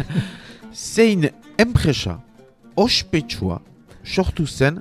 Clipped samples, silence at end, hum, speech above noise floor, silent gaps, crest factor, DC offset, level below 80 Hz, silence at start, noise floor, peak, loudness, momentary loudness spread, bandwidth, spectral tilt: under 0.1%; 0 s; none; 19 dB; none; 20 dB; under 0.1%; -36 dBFS; 0 s; -38 dBFS; 0 dBFS; -20 LUFS; 16 LU; 14.5 kHz; -5 dB/octave